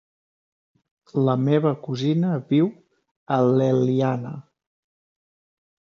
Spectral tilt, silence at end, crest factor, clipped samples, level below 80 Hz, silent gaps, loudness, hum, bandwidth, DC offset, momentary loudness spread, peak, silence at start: -8.5 dB/octave; 1.4 s; 18 dB; under 0.1%; -70 dBFS; 3.11-3.26 s; -22 LUFS; none; 7 kHz; under 0.1%; 10 LU; -6 dBFS; 1.15 s